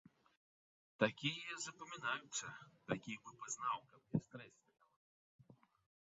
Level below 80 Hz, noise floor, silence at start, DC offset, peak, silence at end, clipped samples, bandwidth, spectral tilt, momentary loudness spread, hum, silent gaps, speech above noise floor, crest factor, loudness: -80 dBFS; under -90 dBFS; 1 s; under 0.1%; -18 dBFS; 0.5 s; under 0.1%; 7.6 kHz; -3 dB/octave; 15 LU; none; 4.96-5.39 s; over 45 dB; 30 dB; -44 LUFS